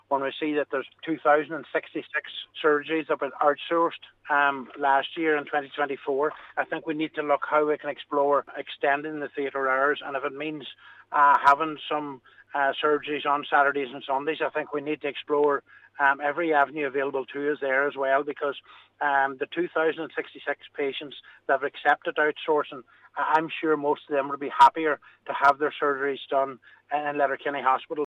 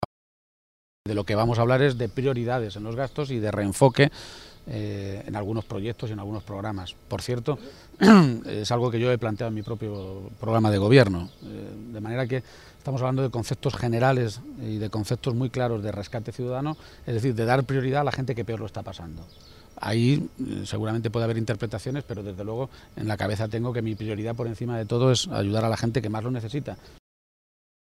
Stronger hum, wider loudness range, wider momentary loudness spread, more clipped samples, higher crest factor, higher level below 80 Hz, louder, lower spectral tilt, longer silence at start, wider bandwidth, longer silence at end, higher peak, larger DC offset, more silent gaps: neither; second, 3 LU vs 7 LU; second, 10 LU vs 15 LU; neither; second, 18 dB vs 24 dB; second, -76 dBFS vs -52 dBFS; about the same, -26 LUFS vs -26 LUFS; about the same, -5.5 dB/octave vs -6.5 dB/octave; about the same, 0.1 s vs 0 s; second, 9 kHz vs 14.5 kHz; second, 0 s vs 1.05 s; second, -8 dBFS vs -2 dBFS; neither; second, none vs 0.05-1.05 s